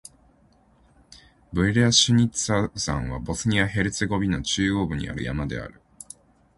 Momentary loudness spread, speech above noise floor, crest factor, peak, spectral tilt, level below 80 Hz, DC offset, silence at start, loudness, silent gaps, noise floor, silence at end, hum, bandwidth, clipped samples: 15 LU; 36 dB; 20 dB; -4 dBFS; -4 dB/octave; -42 dBFS; under 0.1%; 1.1 s; -23 LUFS; none; -59 dBFS; 0.9 s; none; 11.5 kHz; under 0.1%